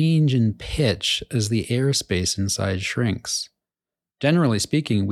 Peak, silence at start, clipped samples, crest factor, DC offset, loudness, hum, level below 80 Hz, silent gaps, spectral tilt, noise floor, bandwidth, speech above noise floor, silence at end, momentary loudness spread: -6 dBFS; 0 s; under 0.1%; 16 dB; under 0.1%; -22 LUFS; none; -44 dBFS; none; -5 dB/octave; under -90 dBFS; 14 kHz; over 69 dB; 0 s; 6 LU